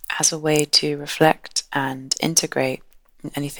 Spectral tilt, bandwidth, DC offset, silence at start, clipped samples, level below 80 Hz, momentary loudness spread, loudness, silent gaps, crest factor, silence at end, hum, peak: -2.5 dB/octave; over 20 kHz; under 0.1%; 0.1 s; under 0.1%; -56 dBFS; 12 LU; -20 LUFS; none; 22 dB; 0 s; none; 0 dBFS